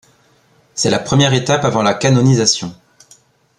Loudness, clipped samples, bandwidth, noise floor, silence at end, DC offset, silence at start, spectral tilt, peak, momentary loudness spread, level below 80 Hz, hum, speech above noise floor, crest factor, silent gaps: -14 LUFS; under 0.1%; 11 kHz; -54 dBFS; 0.85 s; under 0.1%; 0.75 s; -4.5 dB/octave; 0 dBFS; 8 LU; -50 dBFS; none; 40 dB; 16 dB; none